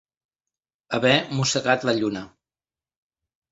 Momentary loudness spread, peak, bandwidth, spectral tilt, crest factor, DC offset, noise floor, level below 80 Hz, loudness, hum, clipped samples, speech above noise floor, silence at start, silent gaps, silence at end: 9 LU; -4 dBFS; 8 kHz; -4 dB/octave; 22 dB; under 0.1%; under -90 dBFS; -62 dBFS; -22 LUFS; none; under 0.1%; over 68 dB; 0.9 s; none; 1.25 s